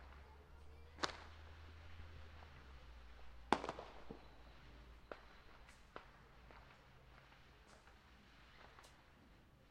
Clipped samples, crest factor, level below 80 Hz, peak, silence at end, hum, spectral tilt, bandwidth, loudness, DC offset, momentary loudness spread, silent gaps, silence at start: under 0.1%; 40 dB; -64 dBFS; -14 dBFS; 0 s; none; -4 dB/octave; 15 kHz; -52 LUFS; under 0.1%; 19 LU; none; 0 s